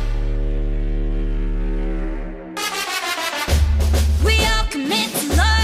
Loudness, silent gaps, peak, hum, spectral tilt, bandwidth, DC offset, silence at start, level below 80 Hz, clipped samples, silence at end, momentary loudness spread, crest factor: -21 LUFS; none; -6 dBFS; none; -4 dB/octave; 15.5 kHz; under 0.1%; 0 s; -20 dBFS; under 0.1%; 0 s; 9 LU; 12 dB